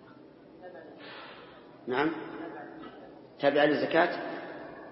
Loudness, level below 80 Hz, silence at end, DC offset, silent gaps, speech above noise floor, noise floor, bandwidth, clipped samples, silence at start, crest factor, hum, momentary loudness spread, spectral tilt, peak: -29 LUFS; -72 dBFS; 0 s; under 0.1%; none; 26 dB; -53 dBFS; 5.8 kHz; under 0.1%; 0 s; 22 dB; none; 24 LU; -8.5 dB/octave; -10 dBFS